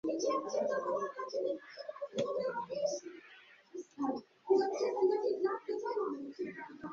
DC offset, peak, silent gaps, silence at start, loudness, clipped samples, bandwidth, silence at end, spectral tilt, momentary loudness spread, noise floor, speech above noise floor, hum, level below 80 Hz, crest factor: under 0.1%; -18 dBFS; none; 0.05 s; -36 LUFS; under 0.1%; 7.4 kHz; 0 s; -3.5 dB/octave; 15 LU; -59 dBFS; 23 dB; none; -80 dBFS; 18 dB